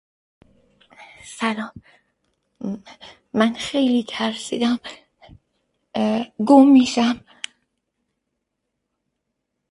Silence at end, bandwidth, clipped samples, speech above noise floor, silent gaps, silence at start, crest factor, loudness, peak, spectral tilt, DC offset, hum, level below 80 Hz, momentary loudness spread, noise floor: 2.5 s; 11.5 kHz; under 0.1%; 59 dB; none; 1 s; 20 dB; -19 LUFS; -2 dBFS; -4.5 dB/octave; under 0.1%; none; -62 dBFS; 22 LU; -78 dBFS